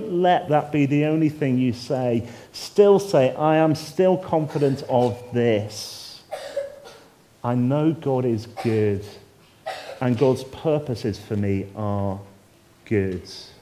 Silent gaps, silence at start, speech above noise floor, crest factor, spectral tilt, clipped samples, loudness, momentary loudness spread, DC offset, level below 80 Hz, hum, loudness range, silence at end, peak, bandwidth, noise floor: none; 0 s; 32 dB; 20 dB; -7 dB/octave; under 0.1%; -22 LUFS; 15 LU; under 0.1%; -52 dBFS; none; 5 LU; 0.1 s; -4 dBFS; 15.5 kHz; -54 dBFS